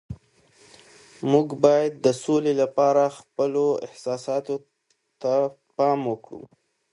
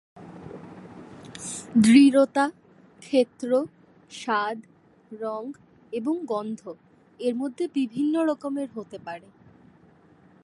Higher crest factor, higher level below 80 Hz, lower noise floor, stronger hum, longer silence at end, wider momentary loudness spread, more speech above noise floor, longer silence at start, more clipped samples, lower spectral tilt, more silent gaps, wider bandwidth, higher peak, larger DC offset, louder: about the same, 22 dB vs 20 dB; first, -62 dBFS vs -68 dBFS; first, -69 dBFS vs -56 dBFS; neither; second, 0.45 s vs 1.25 s; second, 14 LU vs 25 LU; first, 47 dB vs 32 dB; about the same, 0.1 s vs 0.15 s; neither; about the same, -6 dB/octave vs -5 dB/octave; neither; about the same, 11.5 kHz vs 11.5 kHz; first, -2 dBFS vs -6 dBFS; neither; about the same, -23 LUFS vs -24 LUFS